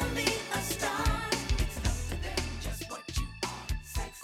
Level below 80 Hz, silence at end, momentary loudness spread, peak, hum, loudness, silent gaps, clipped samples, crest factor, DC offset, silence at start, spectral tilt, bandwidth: -36 dBFS; 0 s; 8 LU; -10 dBFS; none; -33 LUFS; none; under 0.1%; 22 dB; under 0.1%; 0 s; -3.5 dB/octave; 18.5 kHz